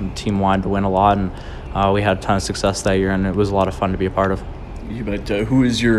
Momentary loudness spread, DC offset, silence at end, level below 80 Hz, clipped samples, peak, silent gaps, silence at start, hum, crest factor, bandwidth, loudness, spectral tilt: 11 LU; under 0.1%; 0 s; -32 dBFS; under 0.1%; -2 dBFS; none; 0 s; none; 16 dB; 12.5 kHz; -19 LUFS; -6 dB/octave